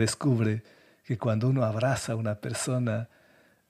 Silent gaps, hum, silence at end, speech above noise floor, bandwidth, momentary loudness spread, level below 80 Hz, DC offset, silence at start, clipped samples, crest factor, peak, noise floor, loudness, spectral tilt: none; none; 0.65 s; 34 dB; 14 kHz; 9 LU; -62 dBFS; under 0.1%; 0 s; under 0.1%; 16 dB; -12 dBFS; -62 dBFS; -29 LUFS; -6 dB/octave